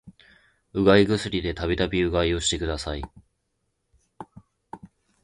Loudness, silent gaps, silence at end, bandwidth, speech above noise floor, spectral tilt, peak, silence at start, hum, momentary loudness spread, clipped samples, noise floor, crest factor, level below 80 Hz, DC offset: -23 LUFS; none; 0.4 s; 11.5 kHz; 52 dB; -5 dB/octave; -2 dBFS; 0.05 s; none; 26 LU; under 0.1%; -75 dBFS; 24 dB; -40 dBFS; under 0.1%